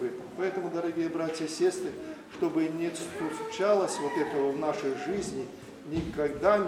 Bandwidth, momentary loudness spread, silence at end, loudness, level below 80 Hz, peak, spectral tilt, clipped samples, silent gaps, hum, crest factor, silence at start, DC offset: 14.5 kHz; 10 LU; 0 s; -31 LUFS; -58 dBFS; -10 dBFS; -5 dB/octave; under 0.1%; none; none; 20 dB; 0 s; under 0.1%